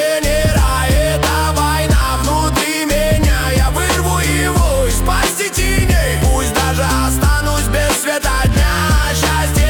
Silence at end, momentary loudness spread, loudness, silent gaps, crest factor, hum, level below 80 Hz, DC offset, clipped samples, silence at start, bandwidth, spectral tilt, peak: 0 s; 2 LU; -14 LUFS; none; 10 dB; none; -18 dBFS; under 0.1%; under 0.1%; 0 s; 19 kHz; -4 dB/octave; -2 dBFS